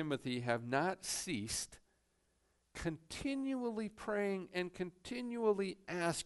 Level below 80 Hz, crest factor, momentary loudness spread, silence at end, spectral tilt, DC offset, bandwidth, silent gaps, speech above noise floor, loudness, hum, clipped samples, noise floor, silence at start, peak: -64 dBFS; 18 dB; 8 LU; 0 s; -4 dB/octave; under 0.1%; 11.5 kHz; none; 39 dB; -39 LUFS; none; under 0.1%; -78 dBFS; 0 s; -22 dBFS